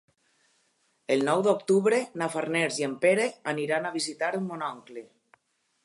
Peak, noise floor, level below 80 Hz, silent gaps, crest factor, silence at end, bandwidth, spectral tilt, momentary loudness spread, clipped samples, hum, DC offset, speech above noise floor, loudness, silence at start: -10 dBFS; -72 dBFS; -82 dBFS; none; 18 dB; 0.8 s; 11.5 kHz; -4.5 dB/octave; 12 LU; under 0.1%; none; under 0.1%; 45 dB; -27 LUFS; 1.1 s